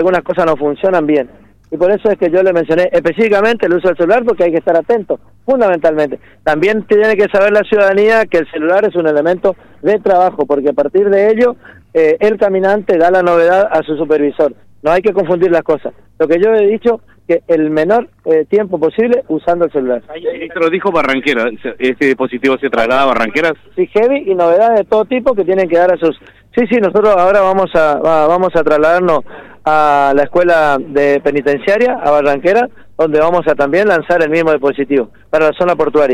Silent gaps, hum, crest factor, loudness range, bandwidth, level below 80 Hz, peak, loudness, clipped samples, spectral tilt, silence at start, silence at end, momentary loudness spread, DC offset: none; none; 10 dB; 2 LU; 10.5 kHz; -46 dBFS; -2 dBFS; -12 LUFS; under 0.1%; -6.5 dB/octave; 0 s; 0 s; 7 LU; under 0.1%